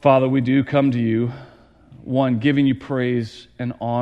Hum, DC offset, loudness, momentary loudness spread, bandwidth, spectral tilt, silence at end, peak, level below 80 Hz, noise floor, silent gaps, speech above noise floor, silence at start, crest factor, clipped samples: none; under 0.1%; -20 LUFS; 13 LU; 7 kHz; -8.5 dB/octave; 0 s; -2 dBFS; -56 dBFS; -47 dBFS; none; 28 dB; 0.05 s; 18 dB; under 0.1%